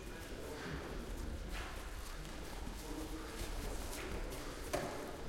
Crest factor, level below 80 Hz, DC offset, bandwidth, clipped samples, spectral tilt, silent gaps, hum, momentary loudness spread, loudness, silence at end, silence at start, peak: 20 dB; -48 dBFS; under 0.1%; 16.5 kHz; under 0.1%; -4.5 dB/octave; none; none; 6 LU; -46 LUFS; 0 s; 0 s; -24 dBFS